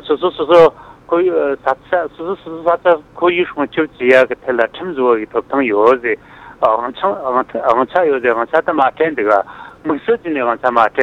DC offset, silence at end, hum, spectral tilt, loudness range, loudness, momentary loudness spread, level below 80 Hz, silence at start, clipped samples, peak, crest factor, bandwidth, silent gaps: under 0.1%; 0 s; none; -6.5 dB/octave; 1 LU; -15 LUFS; 8 LU; -52 dBFS; 0.05 s; under 0.1%; 0 dBFS; 14 dB; 7.4 kHz; none